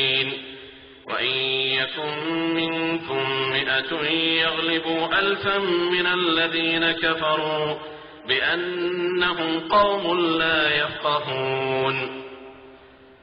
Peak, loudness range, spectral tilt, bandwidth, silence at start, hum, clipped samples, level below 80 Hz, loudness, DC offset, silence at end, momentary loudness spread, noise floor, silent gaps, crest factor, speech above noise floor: -6 dBFS; 2 LU; -1 dB/octave; 5.4 kHz; 0 s; none; under 0.1%; -56 dBFS; -22 LUFS; under 0.1%; 0.35 s; 9 LU; -49 dBFS; none; 18 dB; 26 dB